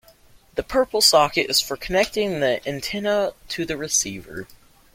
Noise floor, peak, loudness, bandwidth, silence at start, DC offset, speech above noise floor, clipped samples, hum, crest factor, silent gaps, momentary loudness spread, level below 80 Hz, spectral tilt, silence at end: -52 dBFS; -2 dBFS; -21 LUFS; 16.5 kHz; 0.55 s; under 0.1%; 30 dB; under 0.1%; none; 20 dB; none; 16 LU; -48 dBFS; -2 dB/octave; 0.4 s